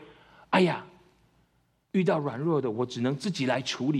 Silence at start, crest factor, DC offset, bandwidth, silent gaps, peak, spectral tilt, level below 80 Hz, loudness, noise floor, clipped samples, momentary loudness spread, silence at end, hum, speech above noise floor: 0 s; 20 dB; under 0.1%; 11.5 kHz; none; -8 dBFS; -6 dB/octave; -70 dBFS; -28 LUFS; -70 dBFS; under 0.1%; 6 LU; 0 s; none; 43 dB